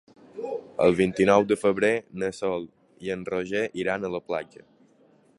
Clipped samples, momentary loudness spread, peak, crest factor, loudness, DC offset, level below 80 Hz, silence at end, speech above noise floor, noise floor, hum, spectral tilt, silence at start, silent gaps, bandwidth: under 0.1%; 16 LU; -4 dBFS; 22 dB; -25 LUFS; under 0.1%; -58 dBFS; 0.95 s; 35 dB; -60 dBFS; none; -6 dB/octave; 0.35 s; none; 11.5 kHz